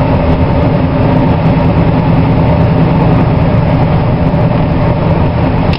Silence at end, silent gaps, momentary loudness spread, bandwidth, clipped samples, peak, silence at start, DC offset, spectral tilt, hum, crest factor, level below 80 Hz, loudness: 0 s; none; 2 LU; 5.6 kHz; 0.3%; 0 dBFS; 0 s; 2%; -10.5 dB/octave; none; 8 dB; -20 dBFS; -10 LUFS